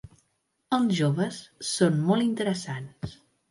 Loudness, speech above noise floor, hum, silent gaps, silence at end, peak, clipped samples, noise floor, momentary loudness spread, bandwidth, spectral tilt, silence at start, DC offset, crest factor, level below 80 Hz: -26 LUFS; 48 dB; none; none; 0.35 s; -10 dBFS; under 0.1%; -74 dBFS; 14 LU; 11.5 kHz; -5.5 dB/octave; 0.7 s; under 0.1%; 18 dB; -60 dBFS